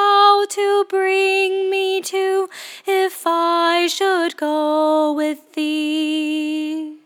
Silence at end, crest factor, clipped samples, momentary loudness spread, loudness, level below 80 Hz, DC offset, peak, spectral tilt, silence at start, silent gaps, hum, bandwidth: 0.1 s; 16 dB; under 0.1%; 7 LU; -18 LUFS; under -90 dBFS; under 0.1%; -2 dBFS; -0.5 dB/octave; 0 s; none; none; 17.5 kHz